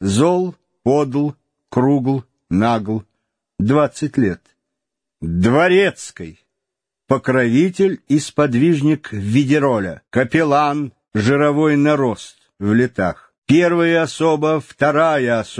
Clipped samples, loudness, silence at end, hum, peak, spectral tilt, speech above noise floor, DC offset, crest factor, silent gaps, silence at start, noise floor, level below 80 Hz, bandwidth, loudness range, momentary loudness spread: under 0.1%; -17 LUFS; 0 s; none; 0 dBFS; -6.5 dB/octave; 66 dB; under 0.1%; 16 dB; 13.38-13.42 s; 0 s; -82 dBFS; -50 dBFS; 10.5 kHz; 3 LU; 10 LU